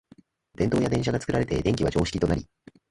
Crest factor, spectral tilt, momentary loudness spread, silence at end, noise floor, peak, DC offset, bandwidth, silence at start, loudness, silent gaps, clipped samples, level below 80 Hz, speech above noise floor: 18 dB; -6.5 dB/octave; 3 LU; 0.45 s; -57 dBFS; -8 dBFS; under 0.1%; 11.5 kHz; 0.6 s; -26 LUFS; none; under 0.1%; -42 dBFS; 32 dB